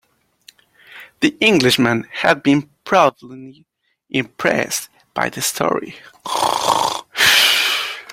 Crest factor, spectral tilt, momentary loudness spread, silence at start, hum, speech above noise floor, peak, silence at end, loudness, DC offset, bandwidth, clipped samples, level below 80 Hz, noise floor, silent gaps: 18 dB; -3 dB/octave; 12 LU; 0.9 s; none; 33 dB; 0 dBFS; 0.1 s; -16 LUFS; under 0.1%; 16.5 kHz; under 0.1%; -58 dBFS; -50 dBFS; none